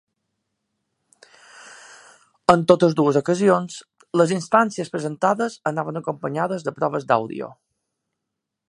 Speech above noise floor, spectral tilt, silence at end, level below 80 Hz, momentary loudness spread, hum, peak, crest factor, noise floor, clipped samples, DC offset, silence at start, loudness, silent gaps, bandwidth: 62 dB; -6 dB/octave; 1.2 s; -62 dBFS; 11 LU; none; 0 dBFS; 22 dB; -82 dBFS; under 0.1%; under 0.1%; 1.55 s; -21 LUFS; none; 11.5 kHz